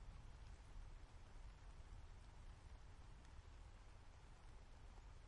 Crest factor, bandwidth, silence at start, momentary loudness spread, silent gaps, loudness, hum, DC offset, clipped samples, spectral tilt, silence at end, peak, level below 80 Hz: 14 dB; 10.5 kHz; 0 s; 3 LU; none; -64 LUFS; none; under 0.1%; under 0.1%; -5 dB/octave; 0 s; -46 dBFS; -60 dBFS